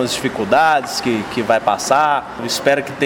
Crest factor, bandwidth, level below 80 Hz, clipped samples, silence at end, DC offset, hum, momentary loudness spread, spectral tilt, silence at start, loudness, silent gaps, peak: 16 dB; 18 kHz; -52 dBFS; under 0.1%; 0 s; under 0.1%; none; 6 LU; -3.5 dB/octave; 0 s; -16 LUFS; none; -2 dBFS